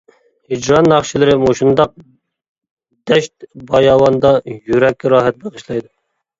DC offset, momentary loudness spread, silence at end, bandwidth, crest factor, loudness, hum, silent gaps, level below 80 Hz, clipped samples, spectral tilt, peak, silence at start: under 0.1%; 14 LU; 0.6 s; 7.8 kHz; 14 dB; -13 LUFS; none; 2.48-2.55 s, 2.71-2.77 s; -44 dBFS; under 0.1%; -5.5 dB/octave; 0 dBFS; 0.5 s